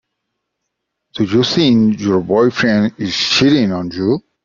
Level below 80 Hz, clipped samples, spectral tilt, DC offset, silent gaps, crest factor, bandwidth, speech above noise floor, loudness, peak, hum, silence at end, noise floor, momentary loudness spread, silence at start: -50 dBFS; under 0.1%; -5.5 dB/octave; under 0.1%; none; 14 dB; 7.6 kHz; 61 dB; -14 LUFS; 0 dBFS; none; 0.25 s; -75 dBFS; 7 LU; 1.15 s